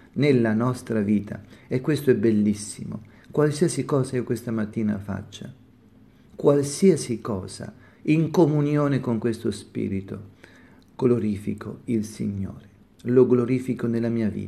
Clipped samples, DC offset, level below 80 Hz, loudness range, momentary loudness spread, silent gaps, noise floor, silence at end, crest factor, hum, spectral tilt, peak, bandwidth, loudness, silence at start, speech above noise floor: under 0.1%; under 0.1%; -60 dBFS; 5 LU; 16 LU; none; -53 dBFS; 0 s; 18 dB; none; -7 dB/octave; -6 dBFS; 13.5 kHz; -24 LUFS; 0.15 s; 30 dB